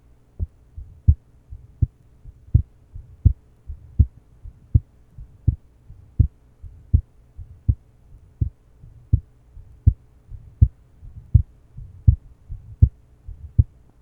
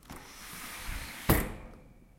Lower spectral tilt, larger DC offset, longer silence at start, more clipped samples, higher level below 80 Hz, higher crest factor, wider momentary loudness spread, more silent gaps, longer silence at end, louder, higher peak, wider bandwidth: first, -12.5 dB/octave vs -4.5 dB/octave; neither; first, 0.4 s vs 0.05 s; neither; first, -28 dBFS vs -42 dBFS; about the same, 24 dB vs 28 dB; first, 24 LU vs 19 LU; neither; first, 0.4 s vs 0.1 s; first, -24 LUFS vs -34 LUFS; first, 0 dBFS vs -8 dBFS; second, 0.9 kHz vs 16.5 kHz